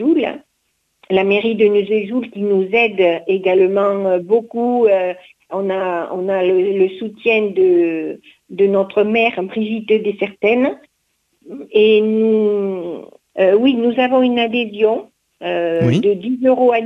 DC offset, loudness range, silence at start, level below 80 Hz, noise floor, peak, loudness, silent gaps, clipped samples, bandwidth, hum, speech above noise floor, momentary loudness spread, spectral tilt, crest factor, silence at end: under 0.1%; 2 LU; 0 s; -58 dBFS; -67 dBFS; -2 dBFS; -16 LUFS; none; under 0.1%; 6.6 kHz; none; 52 dB; 11 LU; -7.5 dB/octave; 14 dB; 0 s